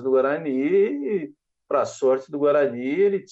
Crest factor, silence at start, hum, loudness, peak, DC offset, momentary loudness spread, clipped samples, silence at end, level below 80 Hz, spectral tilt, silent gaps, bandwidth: 12 dB; 0 s; none; -22 LUFS; -10 dBFS; under 0.1%; 7 LU; under 0.1%; 0.1 s; -74 dBFS; -6.5 dB/octave; none; 8 kHz